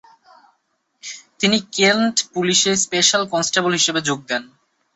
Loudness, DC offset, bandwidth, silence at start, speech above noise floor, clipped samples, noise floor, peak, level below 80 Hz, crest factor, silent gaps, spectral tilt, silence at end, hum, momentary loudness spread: -17 LUFS; under 0.1%; 8.4 kHz; 1.05 s; 50 dB; under 0.1%; -68 dBFS; -2 dBFS; -64 dBFS; 18 dB; none; -2 dB/octave; 0.5 s; none; 14 LU